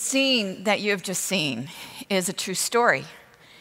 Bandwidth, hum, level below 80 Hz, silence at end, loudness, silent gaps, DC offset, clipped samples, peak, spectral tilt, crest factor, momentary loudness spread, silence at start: 16 kHz; none; -72 dBFS; 0.4 s; -23 LUFS; none; under 0.1%; under 0.1%; -6 dBFS; -2.5 dB/octave; 20 dB; 13 LU; 0 s